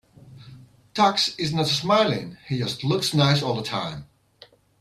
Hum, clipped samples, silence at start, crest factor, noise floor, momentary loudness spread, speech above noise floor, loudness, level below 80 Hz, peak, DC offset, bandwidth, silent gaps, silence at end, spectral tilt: none; under 0.1%; 0.25 s; 18 dB; -53 dBFS; 11 LU; 31 dB; -23 LUFS; -58 dBFS; -6 dBFS; under 0.1%; 14 kHz; none; 0.75 s; -5 dB/octave